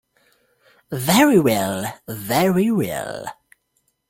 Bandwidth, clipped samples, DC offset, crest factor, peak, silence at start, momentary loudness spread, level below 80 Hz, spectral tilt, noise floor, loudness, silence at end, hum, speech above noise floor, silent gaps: 17 kHz; under 0.1%; under 0.1%; 18 dB; -4 dBFS; 0.9 s; 18 LU; -56 dBFS; -5 dB/octave; -69 dBFS; -19 LUFS; 0.8 s; none; 50 dB; none